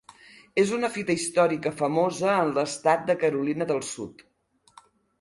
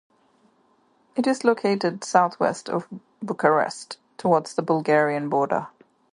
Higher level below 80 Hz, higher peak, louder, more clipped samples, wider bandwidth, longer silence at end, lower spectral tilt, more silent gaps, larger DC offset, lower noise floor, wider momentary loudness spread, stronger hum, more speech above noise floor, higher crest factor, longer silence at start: first, -66 dBFS vs -72 dBFS; second, -8 dBFS vs -2 dBFS; about the same, -25 LUFS vs -23 LUFS; neither; about the same, 11.5 kHz vs 11 kHz; first, 1 s vs 0.45 s; about the same, -4.5 dB/octave vs -5.5 dB/octave; neither; neither; second, -56 dBFS vs -63 dBFS; second, 6 LU vs 13 LU; neither; second, 32 dB vs 40 dB; about the same, 18 dB vs 22 dB; second, 0.55 s vs 1.15 s